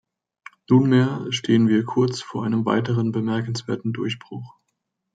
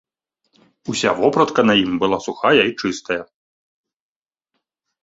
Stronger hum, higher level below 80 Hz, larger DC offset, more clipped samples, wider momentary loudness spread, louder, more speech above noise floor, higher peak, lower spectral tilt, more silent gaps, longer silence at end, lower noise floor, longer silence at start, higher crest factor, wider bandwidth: neither; second, -66 dBFS vs -58 dBFS; neither; neither; about the same, 10 LU vs 11 LU; second, -22 LUFS vs -18 LUFS; about the same, 56 dB vs 59 dB; about the same, -4 dBFS vs -2 dBFS; first, -6.5 dB/octave vs -4.5 dB/octave; neither; second, 0.7 s vs 1.8 s; about the same, -77 dBFS vs -77 dBFS; second, 0.7 s vs 0.85 s; about the same, 18 dB vs 20 dB; first, 9.2 kHz vs 8 kHz